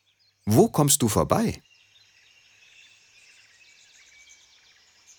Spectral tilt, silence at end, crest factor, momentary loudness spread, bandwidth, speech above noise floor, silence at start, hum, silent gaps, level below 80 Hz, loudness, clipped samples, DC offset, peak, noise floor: -5 dB/octave; 3.6 s; 22 dB; 14 LU; 19 kHz; 37 dB; 0.45 s; none; none; -52 dBFS; -22 LUFS; under 0.1%; under 0.1%; -4 dBFS; -58 dBFS